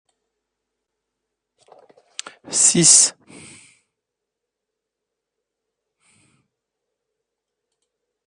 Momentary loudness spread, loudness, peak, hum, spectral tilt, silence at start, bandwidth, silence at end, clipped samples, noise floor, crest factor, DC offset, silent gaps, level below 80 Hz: 25 LU; -12 LUFS; 0 dBFS; none; -1.5 dB/octave; 2.5 s; 10.5 kHz; 5.15 s; under 0.1%; -83 dBFS; 26 dB; under 0.1%; none; -70 dBFS